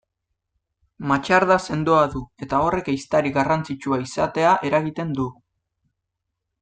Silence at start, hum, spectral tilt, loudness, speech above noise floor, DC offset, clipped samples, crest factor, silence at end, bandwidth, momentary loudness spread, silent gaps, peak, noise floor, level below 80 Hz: 1 s; none; -6 dB/octave; -21 LUFS; 60 dB; under 0.1%; under 0.1%; 20 dB; 1.3 s; 9.4 kHz; 9 LU; none; -2 dBFS; -80 dBFS; -50 dBFS